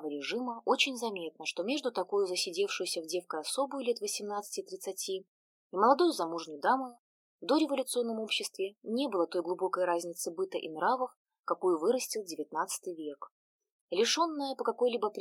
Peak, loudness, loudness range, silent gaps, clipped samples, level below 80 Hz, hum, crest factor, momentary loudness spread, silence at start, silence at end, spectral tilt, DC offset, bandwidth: -12 dBFS; -33 LUFS; 3 LU; 5.28-5.70 s, 6.99-7.39 s, 11.16-11.25 s, 11.40-11.44 s, 13.31-13.59 s, 13.72-13.88 s; under 0.1%; under -90 dBFS; none; 20 dB; 10 LU; 0 s; 0 s; -2.5 dB/octave; under 0.1%; 17 kHz